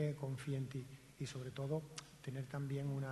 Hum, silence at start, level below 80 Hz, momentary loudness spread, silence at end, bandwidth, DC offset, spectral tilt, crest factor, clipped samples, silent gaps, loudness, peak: none; 0 s; -72 dBFS; 8 LU; 0 s; 12 kHz; under 0.1%; -6.5 dB/octave; 18 dB; under 0.1%; none; -45 LUFS; -26 dBFS